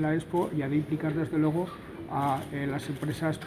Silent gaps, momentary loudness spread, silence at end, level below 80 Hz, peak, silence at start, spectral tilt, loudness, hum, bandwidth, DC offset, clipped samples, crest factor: none; 6 LU; 0 s; -56 dBFS; -16 dBFS; 0 s; -7.5 dB/octave; -30 LUFS; none; 16 kHz; under 0.1%; under 0.1%; 14 dB